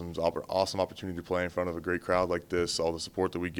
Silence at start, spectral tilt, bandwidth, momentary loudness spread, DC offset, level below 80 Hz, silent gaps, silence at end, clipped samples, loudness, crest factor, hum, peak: 0 s; -4.5 dB/octave; 19 kHz; 5 LU; under 0.1%; -58 dBFS; none; 0 s; under 0.1%; -31 LUFS; 20 dB; none; -12 dBFS